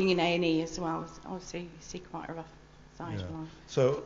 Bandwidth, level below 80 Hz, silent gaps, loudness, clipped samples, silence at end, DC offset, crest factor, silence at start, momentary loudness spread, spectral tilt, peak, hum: 7.8 kHz; -56 dBFS; none; -33 LUFS; under 0.1%; 0 s; under 0.1%; 20 dB; 0 s; 17 LU; -5.5 dB/octave; -12 dBFS; none